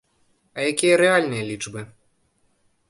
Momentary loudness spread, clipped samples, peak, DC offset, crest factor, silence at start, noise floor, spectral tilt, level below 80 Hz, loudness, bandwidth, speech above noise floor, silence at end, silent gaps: 21 LU; under 0.1%; -2 dBFS; under 0.1%; 22 dB; 0.55 s; -66 dBFS; -4 dB/octave; -62 dBFS; -20 LUFS; 11.5 kHz; 45 dB; 1.05 s; none